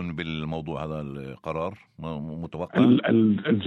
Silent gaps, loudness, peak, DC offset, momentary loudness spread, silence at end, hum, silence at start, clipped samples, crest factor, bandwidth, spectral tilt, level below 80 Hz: none; -26 LUFS; -8 dBFS; under 0.1%; 16 LU; 0 s; none; 0 s; under 0.1%; 18 dB; 5.8 kHz; -8.5 dB/octave; -52 dBFS